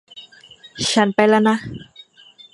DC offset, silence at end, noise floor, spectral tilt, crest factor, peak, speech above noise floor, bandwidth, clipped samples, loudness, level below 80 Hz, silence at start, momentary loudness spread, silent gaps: under 0.1%; 0.7 s; -48 dBFS; -4 dB/octave; 20 dB; 0 dBFS; 31 dB; 11.5 kHz; under 0.1%; -17 LUFS; -56 dBFS; 0.15 s; 23 LU; none